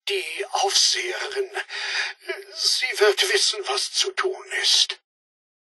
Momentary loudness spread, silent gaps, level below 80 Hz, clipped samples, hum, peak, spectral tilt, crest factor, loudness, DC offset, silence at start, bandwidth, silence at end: 11 LU; none; under -90 dBFS; under 0.1%; none; -4 dBFS; 3.5 dB/octave; 20 dB; -21 LUFS; under 0.1%; 0.05 s; 12 kHz; 0.8 s